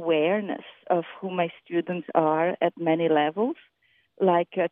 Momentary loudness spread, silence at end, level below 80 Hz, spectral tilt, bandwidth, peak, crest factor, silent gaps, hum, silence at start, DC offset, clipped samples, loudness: 8 LU; 0.05 s; -82 dBFS; -10 dB/octave; 3.8 kHz; -6 dBFS; 20 dB; none; none; 0 s; under 0.1%; under 0.1%; -25 LUFS